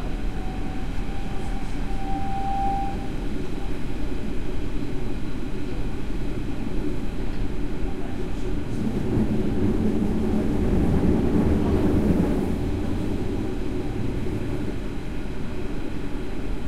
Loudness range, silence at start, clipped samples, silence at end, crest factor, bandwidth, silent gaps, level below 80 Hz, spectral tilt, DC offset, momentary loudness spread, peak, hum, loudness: 8 LU; 0 s; under 0.1%; 0 s; 14 dB; 12.5 kHz; none; -30 dBFS; -8 dB/octave; under 0.1%; 10 LU; -8 dBFS; none; -27 LUFS